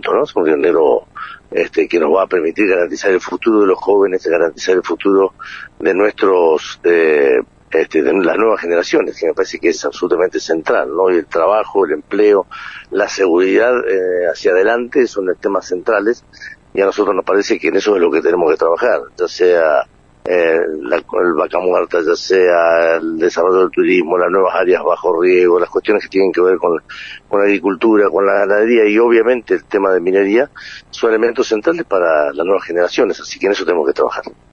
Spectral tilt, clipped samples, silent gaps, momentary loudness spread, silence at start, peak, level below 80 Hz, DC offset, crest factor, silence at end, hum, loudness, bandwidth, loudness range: -4.5 dB/octave; under 0.1%; none; 7 LU; 0.05 s; -2 dBFS; -52 dBFS; under 0.1%; 12 dB; 0.2 s; none; -14 LUFS; 7.4 kHz; 2 LU